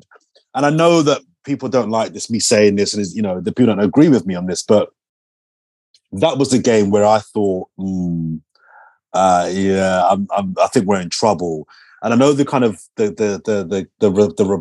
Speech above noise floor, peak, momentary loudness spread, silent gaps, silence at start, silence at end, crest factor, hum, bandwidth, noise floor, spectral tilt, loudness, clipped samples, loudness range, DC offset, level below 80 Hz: 37 dB; 0 dBFS; 11 LU; 5.09-5.94 s; 0.55 s; 0 s; 16 dB; none; 12 kHz; -52 dBFS; -5.5 dB/octave; -16 LUFS; under 0.1%; 2 LU; under 0.1%; -56 dBFS